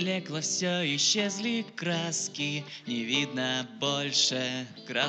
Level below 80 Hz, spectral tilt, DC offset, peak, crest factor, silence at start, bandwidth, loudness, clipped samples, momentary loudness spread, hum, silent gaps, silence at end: -86 dBFS; -2.5 dB/octave; under 0.1%; -10 dBFS; 20 dB; 0 s; 9.4 kHz; -29 LUFS; under 0.1%; 9 LU; none; none; 0 s